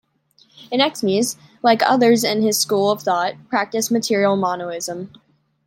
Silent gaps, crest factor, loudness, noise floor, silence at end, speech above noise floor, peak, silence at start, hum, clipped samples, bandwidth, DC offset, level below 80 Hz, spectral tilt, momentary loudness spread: none; 18 dB; -19 LUFS; -57 dBFS; 0.6 s; 39 dB; -2 dBFS; 0.6 s; none; under 0.1%; 16.5 kHz; under 0.1%; -68 dBFS; -3.5 dB/octave; 11 LU